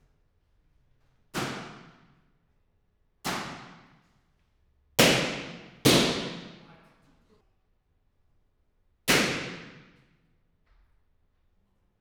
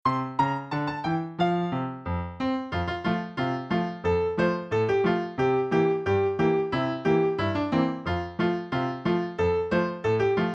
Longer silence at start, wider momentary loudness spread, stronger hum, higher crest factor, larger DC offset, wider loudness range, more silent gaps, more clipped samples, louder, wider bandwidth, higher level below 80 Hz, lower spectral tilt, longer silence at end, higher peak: first, 1.35 s vs 0.05 s; first, 23 LU vs 6 LU; neither; first, 28 dB vs 16 dB; neither; first, 13 LU vs 4 LU; neither; neither; about the same, -26 LUFS vs -26 LUFS; first, over 20 kHz vs 7.8 kHz; second, -60 dBFS vs -50 dBFS; second, -3 dB/octave vs -8 dB/octave; first, 2.3 s vs 0 s; first, -4 dBFS vs -10 dBFS